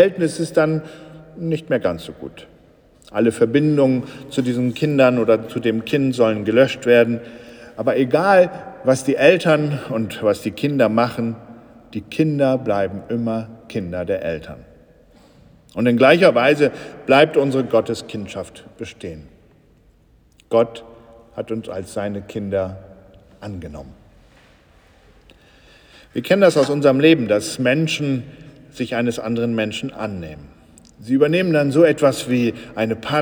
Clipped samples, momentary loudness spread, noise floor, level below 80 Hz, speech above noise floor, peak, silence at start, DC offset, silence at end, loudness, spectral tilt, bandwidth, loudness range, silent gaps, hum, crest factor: under 0.1%; 19 LU; -54 dBFS; -54 dBFS; 36 dB; 0 dBFS; 0 s; under 0.1%; 0 s; -18 LUFS; -6 dB/octave; over 20 kHz; 10 LU; none; none; 18 dB